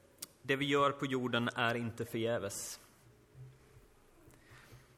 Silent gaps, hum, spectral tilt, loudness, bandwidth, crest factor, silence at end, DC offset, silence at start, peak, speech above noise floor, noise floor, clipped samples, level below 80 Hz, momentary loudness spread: none; none; -4.5 dB/octave; -35 LUFS; 16 kHz; 22 dB; 0.2 s; under 0.1%; 0.2 s; -16 dBFS; 29 dB; -63 dBFS; under 0.1%; -68 dBFS; 25 LU